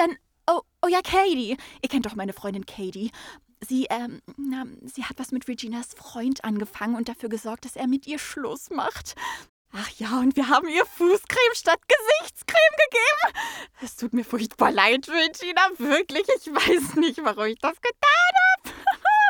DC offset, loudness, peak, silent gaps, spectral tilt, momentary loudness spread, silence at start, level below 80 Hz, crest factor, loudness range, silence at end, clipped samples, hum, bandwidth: under 0.1%; -23 LUFS; -2 dBFS; 9.49-9.65 s; -3 dB/octave; 16 LU; 0 s; -58 dBFS; 22 dB; 10 LU; 0 s; under 0.1%; none; over 20 kHz